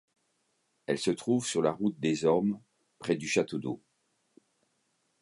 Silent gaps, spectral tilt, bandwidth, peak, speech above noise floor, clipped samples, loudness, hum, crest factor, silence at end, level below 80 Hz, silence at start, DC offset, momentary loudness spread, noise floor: none; -5 dB/octave; 11.5 kHz; -12 dBFS; 47 dB; under 0.1%; -30 LUFS; none; 20 dB; 1.45 s; -70 dBFS; 0.9 s; under 0.1%; 13 LU; -76 dBFS